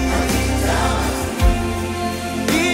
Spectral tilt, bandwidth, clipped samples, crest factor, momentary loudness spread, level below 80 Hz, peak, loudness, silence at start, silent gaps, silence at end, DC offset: -4.5 dB/octave; 16.5 kHz; under 0.1%; 16 dB; 5 LU; -24 dBFS; -4 dBFS; -19 LUFS; 0 s; none; 0 s; under 0.1%